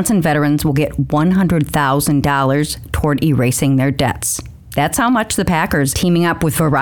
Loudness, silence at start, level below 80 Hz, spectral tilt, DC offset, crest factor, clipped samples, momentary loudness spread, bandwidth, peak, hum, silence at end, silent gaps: -15 LUFS; 0 s; -34 dBFS; -5.5 dB/octave; 0.3%; 14 dB; under 0.1%; 5 LU; 19.5 kHz; 0 dBFS; none; 0 s; none